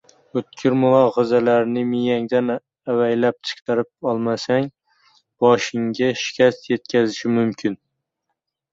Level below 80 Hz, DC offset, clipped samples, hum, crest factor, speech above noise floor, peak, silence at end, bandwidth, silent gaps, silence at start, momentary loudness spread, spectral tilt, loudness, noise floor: -64 dBFS; under 0.1%; under 0.1%; none; 18 dB; 59 dB; -2 dBFS; 1 s; 7.6 kHz; 3.62-3.66 s; 0.35 s; 11 LU; -6 dB/octave; -20 LUFS; -78 dBFS